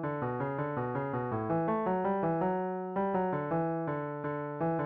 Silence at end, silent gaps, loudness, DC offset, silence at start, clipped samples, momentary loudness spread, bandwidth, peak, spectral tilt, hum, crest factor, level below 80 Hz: 0 s; none; -33 LUFS; under 0.1%; 0 s; under 0.1%; 5 LU; 4.3 kHz; -20 dBFS; -8.5 dB/octave; none; 12 dB; -64 dBFS